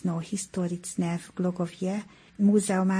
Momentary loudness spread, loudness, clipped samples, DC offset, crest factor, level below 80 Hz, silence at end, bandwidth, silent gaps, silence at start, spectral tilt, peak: 9 LU; -28 LUFS; under 0.1%; under 0.1%; 14 dB; -64 dBFS; 0 s; 10.5 kHz; none; 0 s; -6 dB/octave; -12 dBFS